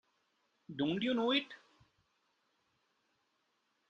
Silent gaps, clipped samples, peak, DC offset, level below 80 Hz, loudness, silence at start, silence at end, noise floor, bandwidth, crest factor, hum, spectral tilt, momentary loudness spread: none; under 0.1%; -20 dBFS; under 0.1%; -78 dBFS; -34 LUFS; 0.7 s; 2.35 s; -80 dBFS; 7.8 kHz; 20 dB; none; -6 dB/octave; 18 LU